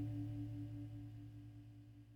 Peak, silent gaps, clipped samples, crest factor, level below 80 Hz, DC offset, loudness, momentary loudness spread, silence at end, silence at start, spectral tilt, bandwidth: -34 dBFS; none; under 0.1%; 14 dB; -64 dBFS; under 0.1%; -50 LUFS; 13 LU; 0 s; 0 s; -9 dB/octave; 5.6 kHz